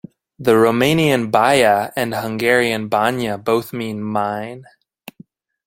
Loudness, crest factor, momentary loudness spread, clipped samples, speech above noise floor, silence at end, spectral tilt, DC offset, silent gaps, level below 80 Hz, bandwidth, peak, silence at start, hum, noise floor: -17 LUFS; 18 dB; 10 LU; under 0.1%; 30 dB; 1.05 s; -5 dB/octave; under 0.1%; none; -56 dBFS; 16.5 kHz; 0 dBFS; 0.4 s; none; -47 dBFS